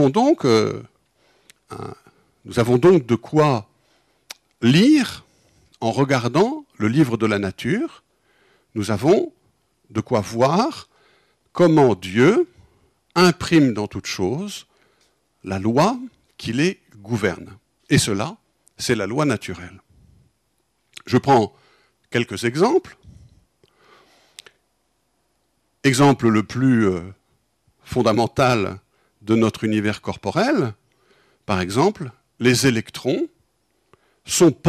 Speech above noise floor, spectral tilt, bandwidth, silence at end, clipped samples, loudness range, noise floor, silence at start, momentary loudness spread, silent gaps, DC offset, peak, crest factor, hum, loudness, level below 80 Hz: 51 dB; -5.5 dB/octave; 14.5 kHz; 0 s; under 0.1%; 6 LU; -69 dBFS; 0 s; 18 LU; none; under 0.1%; -6 dBFS; 16 dB; none; -19 LUFS; -54 dBFS